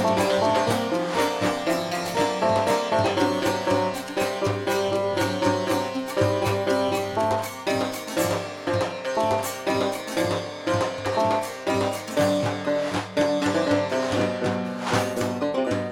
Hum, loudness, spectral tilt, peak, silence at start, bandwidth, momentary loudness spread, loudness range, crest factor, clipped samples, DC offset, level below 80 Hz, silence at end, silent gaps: none; -24 LUFS; -5 dB/octave; -8 dBFS; 0 s; 18.5 kHz; 4 LU; 2 LU; 16 dB; under 0.1%; under 0.1%; -56 dBFS; 0 s; none